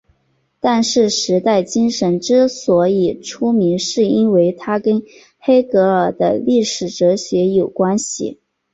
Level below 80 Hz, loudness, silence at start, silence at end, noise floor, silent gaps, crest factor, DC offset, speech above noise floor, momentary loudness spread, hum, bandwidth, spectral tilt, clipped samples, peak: -56 dBFS; -16 LUFS; 0.65 s; 0.4 s; -63 dBFS; none; 14 dB; under 0.1%; 48 dB; 7 LU; none; 8.2 kHz; -5 dB/octave; under 0.1%; -2 dBFS